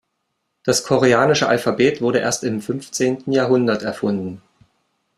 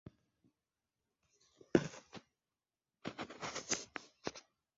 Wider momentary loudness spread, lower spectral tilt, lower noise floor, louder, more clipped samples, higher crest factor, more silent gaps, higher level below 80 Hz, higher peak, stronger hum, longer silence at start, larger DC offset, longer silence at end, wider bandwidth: second, 10 LU vs 22 LU; about the same, -4.5 dB/octave vs -4 dB/octave; second, -73 dBFS vs under -90 dBFS; first, -18 LUFS vs -41 LUFS; neither; second, 18 dB vs 32 dB; neither; first, -58 dBFS vs -76 dBFS; first, -2 dBFS vs -12 dBFS; neither; first, 0.65 s vs 0.05 s; neither; first, 0.8 s vs 0.35 s; first, 15 kHz vs 7.6 kHz